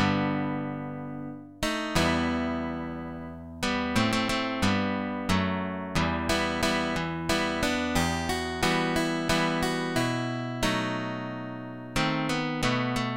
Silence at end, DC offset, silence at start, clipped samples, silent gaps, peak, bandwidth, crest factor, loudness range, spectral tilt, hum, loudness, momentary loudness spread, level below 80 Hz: 0 s; 0.2%; 0 s; under 0.1%; none; -10 dBFS; 16.5 kHz; 18 dB; 2 LU; -4.5 dB/octave; none; -28 LUFS; 10 LU; -46 dBFS